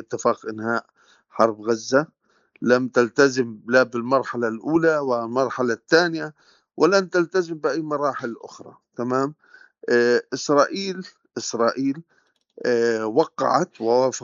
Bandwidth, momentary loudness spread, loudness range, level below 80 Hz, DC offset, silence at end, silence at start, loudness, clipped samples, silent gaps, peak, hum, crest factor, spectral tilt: 7.6 kHz; 12 LU; 3 LU; -74 dBFS; under 0.1%; 0 s; 0 s; -22 LUFS; under 0.1%; none; -2 dBFS; none; 20 dB; -3.5 dB/octave